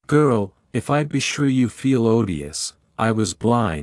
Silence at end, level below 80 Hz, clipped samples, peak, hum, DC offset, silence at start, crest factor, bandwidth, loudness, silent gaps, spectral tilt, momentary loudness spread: 0 s; -50 dBFS; under 0.1%; -4 dBFS; none; under 0.1%; 0.1 s; 16 dB; 12 kHz; -21 LUFS; none; -5.5 dB/octave; 9 LU